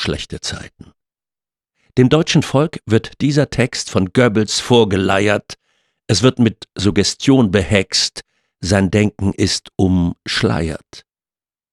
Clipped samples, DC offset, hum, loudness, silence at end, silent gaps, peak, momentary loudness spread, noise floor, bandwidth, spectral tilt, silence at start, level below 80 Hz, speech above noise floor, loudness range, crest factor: under 0.1%; under 0.1%; none; -16 LUFS; 0.75 s; none; 0 dBFS; 11 LU; under -90 dBFS; 12.5 kHz; -5 dB/octave; 0 s; -40 dBFS; over 74 dB; 3 LU; 16 dB